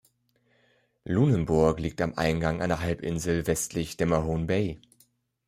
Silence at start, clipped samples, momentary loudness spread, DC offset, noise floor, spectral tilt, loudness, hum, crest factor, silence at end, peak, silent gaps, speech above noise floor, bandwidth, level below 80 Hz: 1.05 s; under 0.1%; 7 LU; under 0.1%; -69 dBFS; -6 dB/octave; -27 LUFS; none; 20 dB; 0.7 s; -8 dBFS; none; 43 dB; 15.5 kHz; -46 dBFS